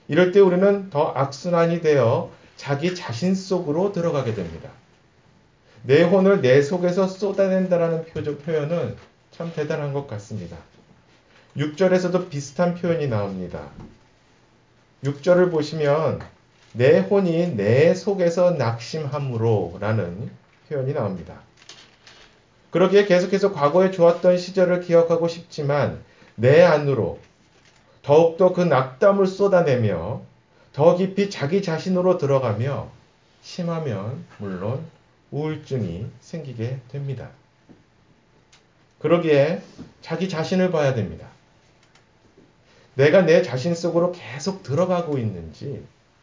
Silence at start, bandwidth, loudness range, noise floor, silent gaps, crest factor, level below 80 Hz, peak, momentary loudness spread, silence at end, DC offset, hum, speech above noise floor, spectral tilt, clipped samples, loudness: 0.1 s; 7.6 kHz; 10 LU; -58 dBFS; none; 20 dB; -54 dBFS; -2 dBFS; 18 LU; 0.35 s; under 0.1%; none; 38 dB; -7 dB/octave; under 0.1%; -21 LUFS